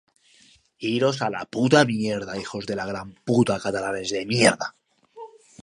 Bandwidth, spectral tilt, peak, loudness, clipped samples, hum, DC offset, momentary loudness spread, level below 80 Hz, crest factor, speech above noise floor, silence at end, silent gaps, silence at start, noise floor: 11.5 kHz; -4.5 dB/octave; -2 dBFS; -23 LUFS; under 0.1%; none; under 0.1%; 15 LU; -60 dBFS; 22 dB; 34 dB; 0.35 s; none; 0.8 s; -57 dBFS